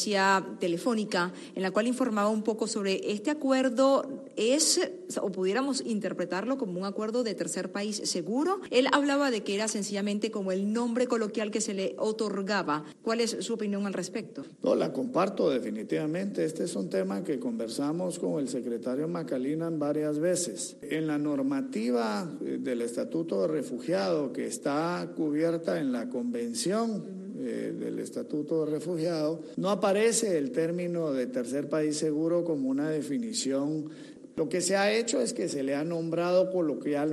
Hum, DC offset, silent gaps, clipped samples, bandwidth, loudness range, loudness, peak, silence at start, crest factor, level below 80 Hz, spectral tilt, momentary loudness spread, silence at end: none; under 0.1%; none; under 0.1%; 12.5 kHz; 4 LU; -30 LUFS; -12 dBFS; 0 s; 18 dB; -78 dBFS; -4 dB/octave; 8 LU; 0 s